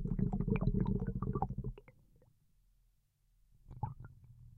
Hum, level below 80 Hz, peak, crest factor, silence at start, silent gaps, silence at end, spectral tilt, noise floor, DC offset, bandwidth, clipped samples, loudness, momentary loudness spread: none; -46 dBFS; -20 dBFS; 20 dB; 0 s; none; 0.05 s; -11.5 dB/octave; -74 dBFS; under 0.1%; 4.2 kHz; under 0.1%; -38 LUFS; 21 LU